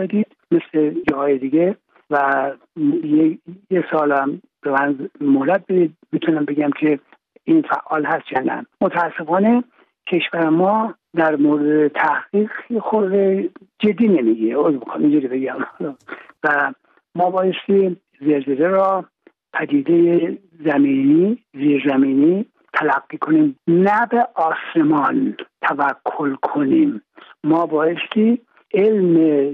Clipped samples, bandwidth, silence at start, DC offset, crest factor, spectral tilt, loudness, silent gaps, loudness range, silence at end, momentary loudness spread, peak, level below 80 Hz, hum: under 0.1%; 4.1 kHz; 0 s; under 0.1%; 14 dB; -9 dB/octave; -18 LUFS; none; 3 LU; 0 s; 9 LU; -4 dBFS; -68 dBFS; none